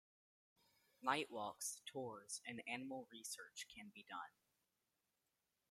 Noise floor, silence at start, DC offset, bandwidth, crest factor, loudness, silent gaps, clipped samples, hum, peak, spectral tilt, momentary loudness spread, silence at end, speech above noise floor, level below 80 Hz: -89 dBFS; 1 s; under 0.1%; 16 kHz; 28 dB; -48 LUFS; none; under 0.1%; none; -24 dBFS; -2 dB/octave; 11 LU; 1.4 s; 40 dB; under -90 dBFS